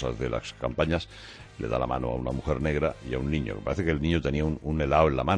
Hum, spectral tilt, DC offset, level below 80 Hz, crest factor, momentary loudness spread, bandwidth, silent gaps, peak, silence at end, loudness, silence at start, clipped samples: none; -7 dB/octave; under 0.1%; -38 dBFS; 20 dB; 8 LU; 10 kHz; none; -8 dBFS; 0 s; -28 LUFS; 0 s; under 0.1%